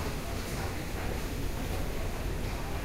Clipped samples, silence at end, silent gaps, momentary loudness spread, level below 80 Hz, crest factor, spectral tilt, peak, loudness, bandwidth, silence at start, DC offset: under 0.1%; 0 s; none; 1 LU; -36 dBFS; 12 dB; -5 dB/octave; -22 dBFS; -36 LUFS; 16 kHz; 0 s; under 0.1%